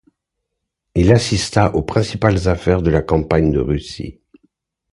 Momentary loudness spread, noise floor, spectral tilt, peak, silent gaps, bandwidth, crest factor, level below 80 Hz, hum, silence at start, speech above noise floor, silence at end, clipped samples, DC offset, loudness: 10 LU; -77 dBFS; -6.5 dB/octave; 0 dBFS; none; 11.5 kHz; 18 dB; -30 dBFS; none; 0.95 s; 61 dB; 0.8 s; under 0.1%; under 0.1%; -16 LUFS